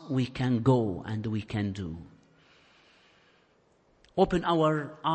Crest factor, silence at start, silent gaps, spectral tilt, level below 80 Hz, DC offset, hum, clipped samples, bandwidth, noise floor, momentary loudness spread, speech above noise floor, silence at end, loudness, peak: 18 dB; 0 s; none; -7.5 dB/octave; -54 dBFS; under 0.1%; none; under 0.1%; 8.6 kHz; -66 dBFS; 12 LU; 38 dB; 0 s; -29 LUFS; -12 dBFS